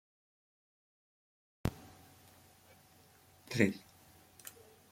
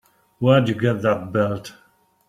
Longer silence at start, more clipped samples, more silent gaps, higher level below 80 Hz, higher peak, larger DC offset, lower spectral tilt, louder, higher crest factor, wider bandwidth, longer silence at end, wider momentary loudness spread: first, 1.65 s vs 0.4 s; neither; neither; about the same, -60 dBFS vs -58 dBFS; second, -12 dBFS vs -2 dBFS; neither; second, -5.5 dB/octave vs -7.5 dB/octave; second, -36 LUFS vs -20 LUFS; first, 32 dB vs 18 dB; first, 16.5 kHz vs 13 kHz; second, 0.4 s vs 0.6 s; first, 28 LU vs 11 LU